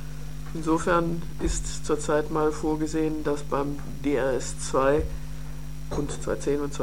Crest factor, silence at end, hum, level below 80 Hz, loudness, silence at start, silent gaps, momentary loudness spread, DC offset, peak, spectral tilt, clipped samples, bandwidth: 18 dB; 0 s; none; -38 dBFS; -27 LUFS; 0 s; none; 14 LU; 2%; -10 dBFS; -5.5 dB/octave; under 0.1%; 17 kHz